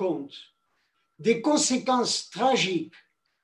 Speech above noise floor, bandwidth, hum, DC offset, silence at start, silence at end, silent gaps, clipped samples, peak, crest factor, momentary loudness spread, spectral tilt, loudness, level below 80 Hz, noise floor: 48 dB; 12 kHz; none; under 0.1%; 0 s; 0.55 s; none; under 0.1%; -10 dBFS; 18 dB; 17 LU; -3 dB/octave; -25 LUFS; -72 dBFS; -73 dBFS